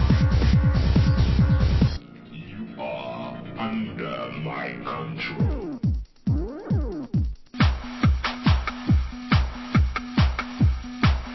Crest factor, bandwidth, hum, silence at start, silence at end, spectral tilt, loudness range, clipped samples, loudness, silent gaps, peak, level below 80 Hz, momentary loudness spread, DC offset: 16 dB; 6 kHz; none; 0 s; 0 s; -7.5 dB/octave; 7 LU; under 0.1%; -24 LUFS; none; -6 dBFS; -28 dBFS; 12 LU; under 0.1%